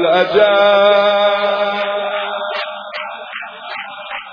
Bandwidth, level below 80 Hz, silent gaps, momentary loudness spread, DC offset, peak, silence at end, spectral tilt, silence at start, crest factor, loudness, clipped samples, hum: 5.2 kHz; -64 dBFS; none; 16 LU; under 0.1%; 0 dBFS; 0 s; -5 dB/octave; 0 s; 14 dB; -14 LUFS; under 0.1%; none